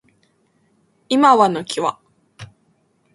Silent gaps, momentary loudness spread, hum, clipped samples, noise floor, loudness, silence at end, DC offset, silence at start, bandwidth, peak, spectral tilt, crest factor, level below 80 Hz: none; 10 LU; none; under 0.1%; -62 dBFS; -16 LUFS; 0.7 s; under 0.1%; 1.1 s; 11.5 kHz; 0 dBFS; -4.5 dB/octave; 20 dB; -64 dBFS